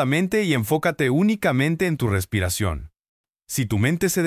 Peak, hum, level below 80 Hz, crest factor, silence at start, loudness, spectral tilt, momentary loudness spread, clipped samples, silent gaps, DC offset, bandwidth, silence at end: -6 dBFS; none; -40 dBFS; 16 dB; 0 s; -22 LUFS; -5.5 dB/octave; 6 LU; under 0.1%; 3.00-3.24 s; under 0.1%; 16 kHz; 0 s